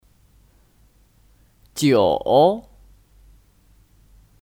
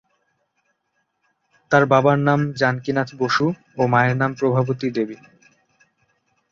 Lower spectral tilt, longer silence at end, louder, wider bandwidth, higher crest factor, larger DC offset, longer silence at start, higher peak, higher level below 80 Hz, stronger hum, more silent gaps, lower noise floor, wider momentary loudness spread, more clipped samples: second, -5.5 dB/octave vs -7 dB/octave; first, 1.85 s vs 1.35 s; about the same, -18 LUFS vs -19 LUFS; first, 17.5 kHz vs 7.4 kHz; about the same, 20 dB vs 20 dB; neither; about the same, 1.75 s vs 1.7 s; about the same, -4 dBFS vs -2 dBFS; first, -52 dBFS vs -60 dBFS; neither; neither; second, -56 dBFS vs -72 dBFS; first, 14 LU vs 8 LU; neither